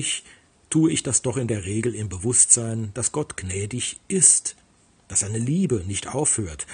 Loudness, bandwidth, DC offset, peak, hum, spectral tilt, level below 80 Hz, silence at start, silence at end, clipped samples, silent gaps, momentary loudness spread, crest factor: -21 LUFS; 10.5 kHz; under 0.1%; 0 dBFS; none; -3.5 dB/octave; -54 dBFS; 0 s; 0 s; under 0.1%; none; 14 LU; 24 dB